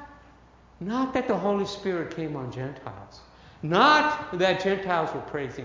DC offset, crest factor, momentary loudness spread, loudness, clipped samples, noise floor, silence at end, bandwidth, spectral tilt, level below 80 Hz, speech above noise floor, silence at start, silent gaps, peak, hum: under 0.1%; 22 dB; 18 LU; -25 LUFS; under 0.1%; -54 dBFS; 0 s; 7.6 kHz; -5.5 dB/octave; -56 dBFS; 28 dB; 0 s; none; -6 dBFS; none